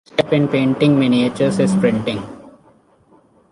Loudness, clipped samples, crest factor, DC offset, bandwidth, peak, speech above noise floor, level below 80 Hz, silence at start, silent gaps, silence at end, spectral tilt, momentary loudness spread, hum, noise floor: -16 LUFS; under 0.1%; 16 dB; under 0.1%; 11.5 kHz; -2 dBFS; 37 dB; -52 dBFS; 0.15 s; none; 1 s; -7 dB/octave; 9 LU; none; -53 dBFS